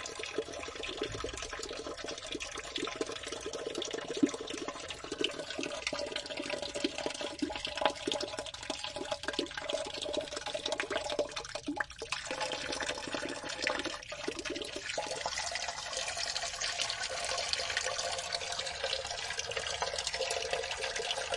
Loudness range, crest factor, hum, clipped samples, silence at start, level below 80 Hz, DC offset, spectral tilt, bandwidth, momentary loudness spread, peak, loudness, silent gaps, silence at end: 3 LU; 28 dB; none; under 0.1%; 0 s; -60 dBFS; under 0.1%; -1.5 dB/octave; 11.5 kHz; 6 LU; -10 dBFS; -36 LUFS; none; 0 s